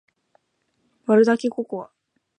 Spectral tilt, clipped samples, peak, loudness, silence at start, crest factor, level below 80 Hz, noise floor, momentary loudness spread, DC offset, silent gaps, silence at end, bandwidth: -6.5 dB/octave; under 0.1%; -6 dBFS; -20 LUFS; 1.1 s; 18 dB; -76 dBFS; -71 dBFS; 17 LU; under 0.1%; none; 0.55 s; 10 kHz